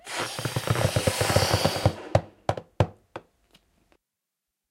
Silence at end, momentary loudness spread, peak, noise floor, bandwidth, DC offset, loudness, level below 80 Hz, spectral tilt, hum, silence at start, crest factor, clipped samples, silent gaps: 1.5 s; 10 LU; -4 dBFS; -85 dBFS; 16 kHz; under 0.1%; -26 LUFS; -46 dBFS; -4.5 dB/octave; none; 0.05 s; 24 dB; under 0.1%; none